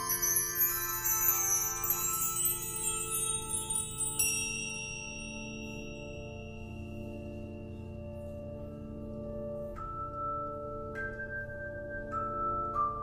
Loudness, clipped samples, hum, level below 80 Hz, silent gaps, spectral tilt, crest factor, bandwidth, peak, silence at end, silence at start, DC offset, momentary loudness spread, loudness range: -32 LUFS; under 0.1%; none; -52 dBFS; none; -2 dB/octave; 22 dB; 15.5 kHz; -14 dBFS; 0 s; 0 s; under 0.1%; 16 LU; 14 LU